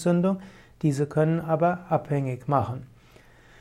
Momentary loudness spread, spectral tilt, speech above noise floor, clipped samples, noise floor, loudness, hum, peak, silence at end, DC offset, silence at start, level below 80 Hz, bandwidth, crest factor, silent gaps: 7 LU; -8 dB/octave; 29 dB; under 0.1%; -53 dBFS; -26 LUFS; none; -8 dBFS; 0.75 s; under 0.1%; 0 s; -58 dBFS; 11.5 kHz; 16 dB; none